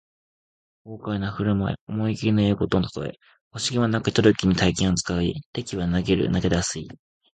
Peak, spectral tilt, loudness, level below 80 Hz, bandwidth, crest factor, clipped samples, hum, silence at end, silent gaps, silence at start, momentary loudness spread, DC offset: -2 dBFS; -5.5 dB/octave; -23 LUFS; -42 dBFS; 9.4 kHz; 22 dB; under 0.1%; none; 0.4 s; 1.81-1.87 s, 3.41-3.51 s, 5.46-5.53 s; 0.85 s; 14 LU; under 0.1%